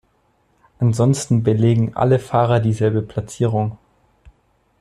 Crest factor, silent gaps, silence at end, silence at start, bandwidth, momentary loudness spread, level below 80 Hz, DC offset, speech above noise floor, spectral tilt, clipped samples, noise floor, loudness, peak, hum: 16 dB; none; 1.05 s; 0.8 s; 11.5 kHz; 7 LU; -50 dBFS; under 0.1%; 45 dB; -7.5 dB/octave; under 0.1%; -62 dBFS; -18 LUFS; -2 dBFS; none